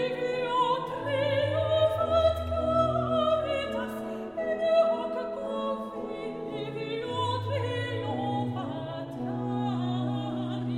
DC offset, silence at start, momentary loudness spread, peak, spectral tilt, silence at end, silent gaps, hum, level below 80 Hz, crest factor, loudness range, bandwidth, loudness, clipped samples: under 0.1%; 0 s; 10 LU; -12 dBFS; -7 dB/octave; 0 s; none; none; -50 dBFS; 16 dB; 6 LU; 14 kHz; -29 LUFS; under 0.1%